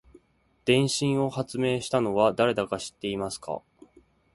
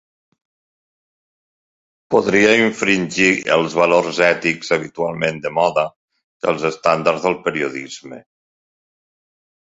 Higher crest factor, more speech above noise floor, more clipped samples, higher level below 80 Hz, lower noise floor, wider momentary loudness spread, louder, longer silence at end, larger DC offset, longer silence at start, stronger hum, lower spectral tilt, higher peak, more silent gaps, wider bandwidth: about the same, 20 dB vs 18 dB; second, 40 dB vs over 73 dB; neither; about the same, -60 dBFS vs -58 dBFS; second, -66 dBFS vs under -90 dBFS; about the same, 10 LU vs 10 LU; second, -26 LUFS vs -17 LUFS; second, 0.75 s vs 1.45 s; neither; second, 0.65 s vs 2.1 s; neither; about the same, -5 dB/octave vs -4.5 dB/octave; second, -8 dBFS vs 0 dBFS; second, none vs 5.96-6.08 s, 6.24-6.40 s; first, 11.5 kHz vs 8 kHz